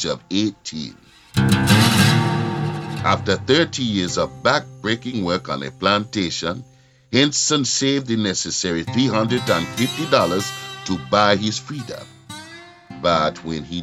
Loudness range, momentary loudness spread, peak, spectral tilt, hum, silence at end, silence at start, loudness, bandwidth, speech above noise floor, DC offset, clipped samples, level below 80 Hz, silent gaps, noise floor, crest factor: 4 LU; 14 LU; 0 dBFS; -4 dB/octave; none; 0 s; 0 s; -19 LUFS; 16.5 kHz; 21 dB; under 0.1%; under 0.1%; -50 dBFS; none; -41 dBFS; 20 dB